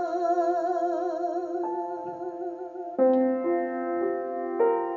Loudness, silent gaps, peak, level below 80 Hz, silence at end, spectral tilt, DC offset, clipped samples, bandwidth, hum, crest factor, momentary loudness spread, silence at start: -28 LUFS; none; -12 dBFS; -80 dBFS; 0 s; -6.5 dB/octave; under 0.1%; under 0.1%; 7.4 kHz; none; 16 dB; 11 LU; 0 s